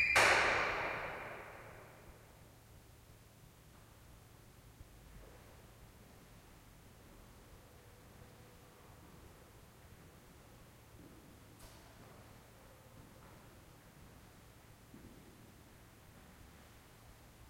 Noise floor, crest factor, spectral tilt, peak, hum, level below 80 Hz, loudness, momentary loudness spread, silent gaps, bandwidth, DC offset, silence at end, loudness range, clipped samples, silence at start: -61 dBFS; 28 dB; -2.5 dB/octave; -16 dBFS; none; -64 dBFS; -33 LUFS; 19 LU; none; 16.5 kHz; under 0.1%; 1.05 s; 13 LU; under 0.1%; 0 s